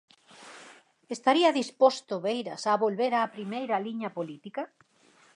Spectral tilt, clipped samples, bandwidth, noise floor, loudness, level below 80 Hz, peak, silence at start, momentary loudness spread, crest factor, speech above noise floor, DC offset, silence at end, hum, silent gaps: -4.5 dB/octave; under 0.1%; 11 kHz; -61 dBFS; -28 LUFS; -86 dBFS; -8 dBFS; 0.4 s; 19 LU; 22 dB; 34 dB; under 0.1%; 0.7 s; none; none